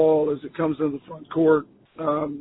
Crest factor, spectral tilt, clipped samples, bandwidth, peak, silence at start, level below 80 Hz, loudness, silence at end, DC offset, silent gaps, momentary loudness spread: 16 dB; -12 dB/octave; under 0.1%; 4 kHz; -6 dBFS; 0 s; -60 dBFS; -24 LUFS; 0 s; under 0.1%; none; 10 LU